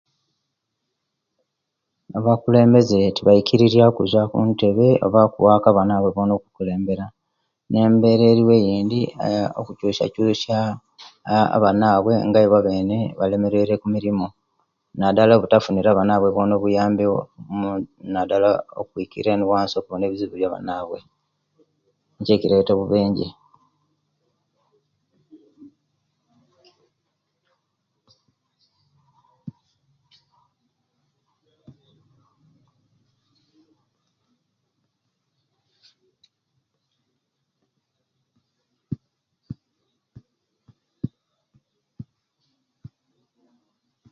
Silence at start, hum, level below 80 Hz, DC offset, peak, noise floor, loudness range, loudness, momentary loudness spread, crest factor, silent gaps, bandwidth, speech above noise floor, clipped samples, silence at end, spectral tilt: 2.1 s; none; -54 dBFS; under 0.1%; 0 dBFS; -79 dBFS; 9 LU; -18 LUFS; 16 LU; 20 dB; none; 7.2 kHz; 61 dB; under 0.1%; 2.1 s; -8 dB/octave